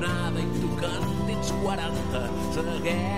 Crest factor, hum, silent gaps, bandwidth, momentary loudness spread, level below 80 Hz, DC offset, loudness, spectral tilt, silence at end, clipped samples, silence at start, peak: 12 dB; none; none; 16 kHz; 2 LU; -40 dBFS; 2%; -28 LUFS; -5.5 dB/octave; 0 s; under 0.1%; 0 s; -16 dBFS